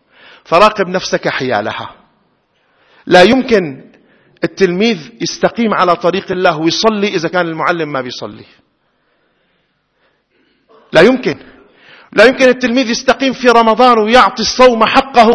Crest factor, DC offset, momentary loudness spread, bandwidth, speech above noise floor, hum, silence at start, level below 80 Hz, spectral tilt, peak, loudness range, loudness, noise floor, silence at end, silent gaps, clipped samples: 12 dB; under 0.1%; 13 LU; 11 kHz; 50 dB; none; 0.5 s; -46 dBFS; -4.5 dB/octave; 0 dBFS; 8 LU; -11 LUFS; -61 dBFS; 0 s; none; 1%